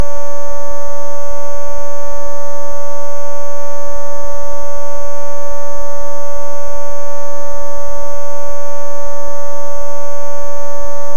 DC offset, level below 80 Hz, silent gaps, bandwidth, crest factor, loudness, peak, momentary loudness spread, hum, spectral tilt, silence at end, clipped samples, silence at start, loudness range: 90%; -40 dBFS; none; 16 kHz; 14 dB; -26 LUFS; 0 dBFS; 0 LU; none; -5.5 dB/octave; 0 s; 0.2%; 0 s; 0 LU